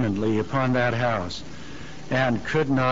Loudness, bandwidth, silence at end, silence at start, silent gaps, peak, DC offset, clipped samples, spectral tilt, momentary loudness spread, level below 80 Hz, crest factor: -24 LUFS; 7.8 kHz; 0 s; 0 s; none; -10 dBFS; 1%; under 0.1%; -5.5 dB/octave; 17 LU; -50 dBFS; 14 dB